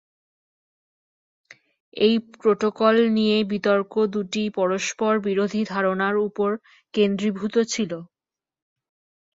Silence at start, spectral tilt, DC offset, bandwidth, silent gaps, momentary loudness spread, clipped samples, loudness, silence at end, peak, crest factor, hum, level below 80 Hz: 1.95 s; -5 dB/octave; under 0.1%; 7.8 kHz; none; 7 LU; under 0.1%; -22 LUFS; 1.3 s; -6 dBFS; 18 dB; none; -68 dBFS